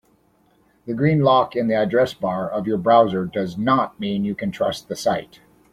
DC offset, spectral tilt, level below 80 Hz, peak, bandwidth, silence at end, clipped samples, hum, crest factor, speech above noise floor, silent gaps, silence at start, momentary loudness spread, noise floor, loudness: under 0.1%; -6.5 dB/octave; -56 dBFS; -2 dBFS; 15.5 kHz; 0.45 s; under 0.1%; none; 18 dB; 40 dB; none; 0.85 s; 9 LU; -60 dBFS; -20 LUFS